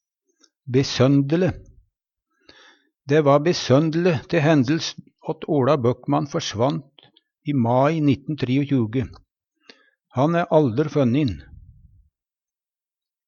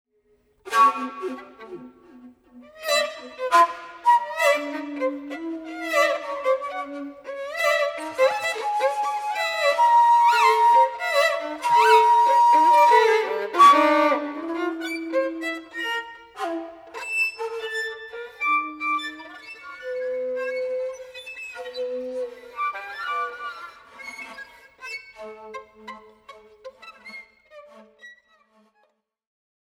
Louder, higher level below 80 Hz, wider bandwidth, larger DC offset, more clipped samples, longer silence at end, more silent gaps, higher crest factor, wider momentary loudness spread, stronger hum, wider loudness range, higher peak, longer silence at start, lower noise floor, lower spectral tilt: about the same, -21 LUFS vs -21 LUFS; first, -52 dBFS vs -70 dBFS; second, 7.2 kHz vs 17 kHz; neither; neither; first, 1.85 s vs 1.65 s; neither; about the same, 18 dB vs 20 dB; second, 12 LU vs 23 LU; neither; second, 3 LU vs 17 LU; about the same, -4 dBFS vs -4 dBFS; about the same, 0.65 s vs 0.65 s; first, under -90 dBFS vs -68 dBFS; first, -6.5 dB/octave vs -1.5 dB/octave